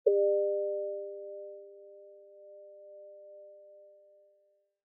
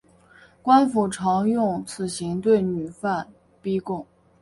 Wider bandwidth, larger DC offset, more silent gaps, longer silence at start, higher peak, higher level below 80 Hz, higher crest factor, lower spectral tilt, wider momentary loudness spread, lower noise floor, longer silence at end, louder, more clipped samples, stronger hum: second, 0.7 kHz vs 11.5 kHz; neither; neither; second, 0.05 s vs 0.65 s; second, -12 dBFS vs -4 dBFS; second, under -90 dBFS vs -60 dBFS; about the same, 22 dB vs 18 dB; second, 5 dB/octave vs -6 dB/octave; first, 26 LU vs 13 LU; first, -71 dBFS vs -53 dBFS; first, 1.15 s vs 0.4 s; second, -32 LUFS vs -23 LUFS; neither; neither